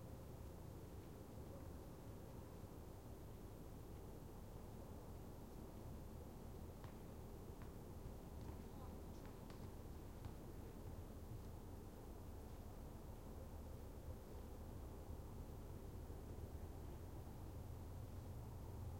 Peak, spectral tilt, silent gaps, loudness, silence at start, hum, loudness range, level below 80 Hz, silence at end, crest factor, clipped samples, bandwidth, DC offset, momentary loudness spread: -40 dBFS; -7 dB/octave; none; -56 LUFS; 0 s; none; 2 LU; -58 dBFS; 0 s; 14 dB; under 0.1%; 16.5 kHz; under 0.1%; 3 LU